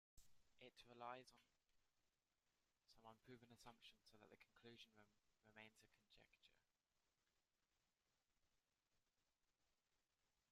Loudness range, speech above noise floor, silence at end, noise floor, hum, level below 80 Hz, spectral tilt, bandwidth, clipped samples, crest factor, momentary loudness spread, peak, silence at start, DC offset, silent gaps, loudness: 3 LU; over 23 dB; 0.1 s; under -90 dBFS; none; -90 dBFS; -3.5 dB/octave; 12 kHz; under 0.1%; 28 dB; 10 LU; -42 dBFS; 0.15 s; under 0.1%; none; -65 LUFS